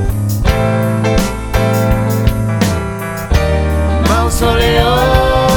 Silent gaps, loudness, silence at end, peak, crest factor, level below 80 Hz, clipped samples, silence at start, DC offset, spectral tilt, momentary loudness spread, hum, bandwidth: none; -13 LUFS; 0 s; 0 dBFS; 12 dB; -20 dBFS; under 0.1%; 0 s; under 0.1%; -5.5 dB/octave; 5 LU; none; over 20 kHz